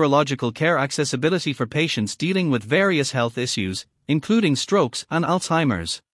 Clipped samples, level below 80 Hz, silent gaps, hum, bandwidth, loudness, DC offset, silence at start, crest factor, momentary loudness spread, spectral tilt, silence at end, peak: under 0.1%; -60 dBFS; none; none; 12 kHz; -21 LUFS; under 0.1%; 0 s; 16 dB; 5 LU; -5 dB/octave; 0.15 s; -4 dBFS